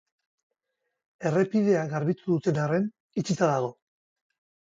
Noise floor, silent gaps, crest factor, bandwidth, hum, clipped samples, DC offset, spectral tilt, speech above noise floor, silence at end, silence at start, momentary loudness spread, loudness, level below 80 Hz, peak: -82 dBFS; 3.00-3.09 s; 18 dB; 7.8 kHz; none; under 0.1%; under 0.1%; -7 dB/octave; 57 dB; 0.95 s; 1.2 s; 8 LU; -27 LUFS; -70 dBFS; -10 dBFS